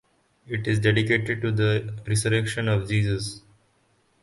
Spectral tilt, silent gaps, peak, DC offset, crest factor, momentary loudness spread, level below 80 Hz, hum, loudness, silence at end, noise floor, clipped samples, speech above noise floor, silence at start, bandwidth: -5.5 dB/octave; none; -6 dBFS; under 0.1%; 18 dB; 9 LU; -50 dBFS; none; -24 LUFS; 0.85 s; -65 dBFS; under 0.1%; 42 dB; 0.5 s; 11.5 kHz